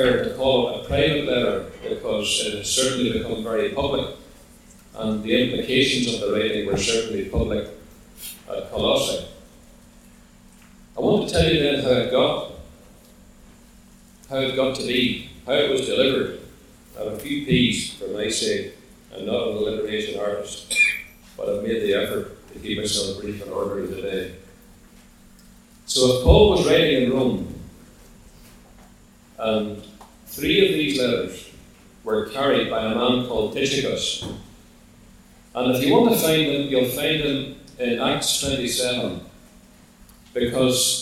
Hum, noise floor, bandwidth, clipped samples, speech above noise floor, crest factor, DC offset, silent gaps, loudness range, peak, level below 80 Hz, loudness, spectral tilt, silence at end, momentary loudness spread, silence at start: none; -50 dBFS; 16.5 kHz; under 0.1%; 29 dB; 22 dB; under 0.1%; none; 6 LU; -2 dBFS; -40 dBFS; -22 LUFS; -4 dB/octave; 0 s; 15 LU; 0 s